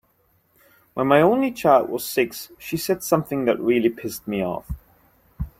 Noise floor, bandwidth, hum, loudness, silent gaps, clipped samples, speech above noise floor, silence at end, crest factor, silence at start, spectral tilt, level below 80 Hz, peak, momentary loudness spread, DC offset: -64 dBFS; 16.5 kHz; none; -21 LUFS; none; under 0.1%; 43 dB; 0.1 s; 20 dB; 0.95 s; -5.5 dB/octave; -44 dBFS; -2 dBFS; 17 LU; under 0.1%